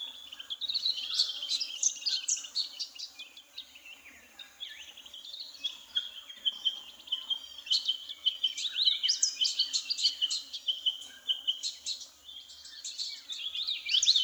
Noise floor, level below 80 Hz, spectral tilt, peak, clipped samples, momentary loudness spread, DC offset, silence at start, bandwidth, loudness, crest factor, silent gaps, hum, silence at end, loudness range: -53 dBFS; -80 dBFS; 4.5 dB/octave; -12 dBFS; under 0.1%; 19 LU; under 0.1%; 0 s; over 20 kHz; -30 LUFS; 22 dB; none; none; 0 s; 10 LU